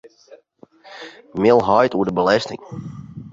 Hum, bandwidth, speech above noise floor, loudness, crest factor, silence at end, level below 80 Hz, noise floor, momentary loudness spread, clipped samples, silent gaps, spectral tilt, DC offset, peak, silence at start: none; 7.6 kHz; 33 dB; -17 LUFS; 18 dB; 0 s; -54 dBFS; -50 dBFS; 22 LU; under 0.1%; none; -6 dB/octave; under 0.1%; -2 dBFS; 0.05 s